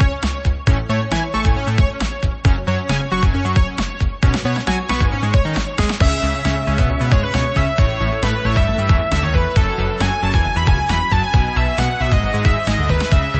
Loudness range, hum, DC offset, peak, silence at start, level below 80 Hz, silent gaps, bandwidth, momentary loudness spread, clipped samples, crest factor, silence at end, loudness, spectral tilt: 1 LU; none; under 0.1%; -4 dBFS; 0 s; -20 dBFS; none; 8.6 kHz; 3 LU; under 0.1%; 14 dB; 0 s; -18 LUFS; -6 dB/octave